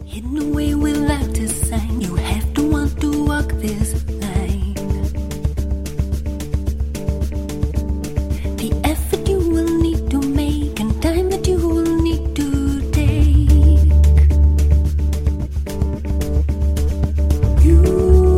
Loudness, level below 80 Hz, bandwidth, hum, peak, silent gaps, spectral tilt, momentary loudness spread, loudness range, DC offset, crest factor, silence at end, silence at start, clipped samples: -18 LUFS; -18 dBFS; 15 kHz; none; 0 dBFS; none; -7 dB/octave; 11 LU; 8 LU; under 0.1%; 16 dB; 0 s; 0 s; under 0.1%